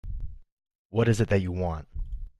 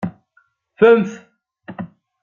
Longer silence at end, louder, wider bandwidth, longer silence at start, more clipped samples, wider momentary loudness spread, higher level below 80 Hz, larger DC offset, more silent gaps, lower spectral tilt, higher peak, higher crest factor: second, 0.1 s vs 0.35 s; second, -27 LUFS vs -15 LUFS; first, 12 kHz vs 7 kHz; about the same, 0.05 s vs 0 s; neither; second, 17 LU vs 23 LU; first, -38 dBFS vs -64 dBFS; neither; first, 0.52-0.57 s, 0.75-0.90 s vs none; about the same, -7 dB/octave vs -7.5 dB/octave; second, -10 dBFS vs -2 dBFS; about the same, 20 dB vs 18 dB